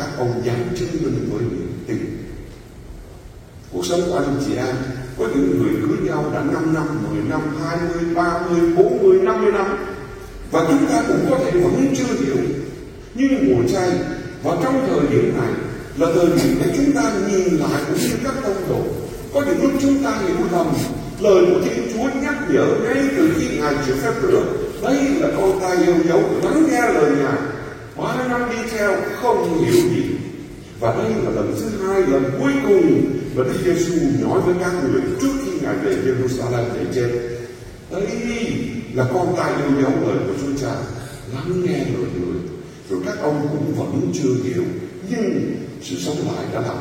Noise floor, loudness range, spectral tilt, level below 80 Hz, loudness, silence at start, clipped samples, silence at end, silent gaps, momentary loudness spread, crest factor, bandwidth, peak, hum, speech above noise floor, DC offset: -39 dBFS; 5 LU; -6 dB/octave; -42 dBFS; -19 LUFS; 0 s; under 0.1%; 0 s; none; 11 LU; 18 dB; 16.5 kHz; 0 dBFS; none; 21 dB; under 0.1%